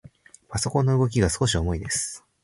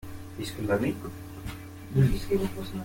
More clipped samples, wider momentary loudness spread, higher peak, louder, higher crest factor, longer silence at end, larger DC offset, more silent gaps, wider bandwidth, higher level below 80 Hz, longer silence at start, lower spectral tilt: neither; second, 8 LU vs 15 LU; first, -6 dBFS vs -12 dBFS; first, -24 LUFS vs -29 LUFS; about the same, 18 dB vs 18 dB; first, 0.25 s vs 0 s; neither; neither; second, 11.5 kHz vs 17 kHz; about the same, -38 dBFS vs -42 dBFS; first, 0.5 s vs 0 s; second, -4.5 dB/octave vs -7 dB/octave